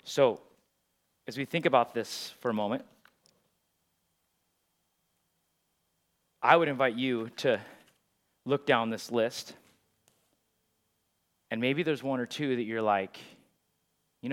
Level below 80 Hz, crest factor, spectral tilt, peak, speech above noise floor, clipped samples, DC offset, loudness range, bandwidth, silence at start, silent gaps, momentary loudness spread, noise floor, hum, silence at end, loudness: -86 dBFS; 28 dB; -5 dB/octave; -6 dBFS; 48 dB; under 0.1%; under 0.1%; 7 LU; 16.5 kHz; 0.05 s; none; 16 LU; -77 dBFS; none; 0 s; -29 LUFS